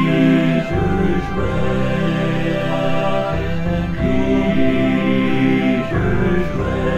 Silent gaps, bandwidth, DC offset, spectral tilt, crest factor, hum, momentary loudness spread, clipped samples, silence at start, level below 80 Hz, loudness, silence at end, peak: none; 9.6 kHz; under 0.1%; -8 dB/octave; 14 dB; none; 5 LU; under 0.1%; 0 s; -30 dBFS; -18 LUFS; 0 s; -2 dBFS